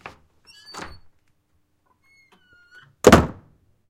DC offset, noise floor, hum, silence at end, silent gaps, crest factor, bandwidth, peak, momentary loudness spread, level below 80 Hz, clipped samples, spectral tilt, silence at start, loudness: under 0.1%; -67 dBFS; none; 0.6 s; none; 24 dB; 16.5 kHz; 0 dBFS; 26 LU; -40 dBFS; under 0.1%; -5 dB/octave; 0.75 s; -17 LUFS